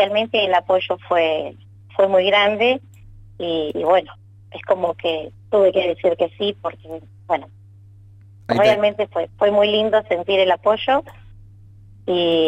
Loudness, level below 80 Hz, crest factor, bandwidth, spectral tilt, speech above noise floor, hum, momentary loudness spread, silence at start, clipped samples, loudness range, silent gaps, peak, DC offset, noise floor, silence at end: -19 LUFS; -54 dBFS; 16 dB; 9 kHz; -5.5 dB/octave; 26 dB; none; 14 LU; 0 s; under 0.1%; 4 LU; none; -4 dBFS; under 0.1%; -45 dBFS; 0 s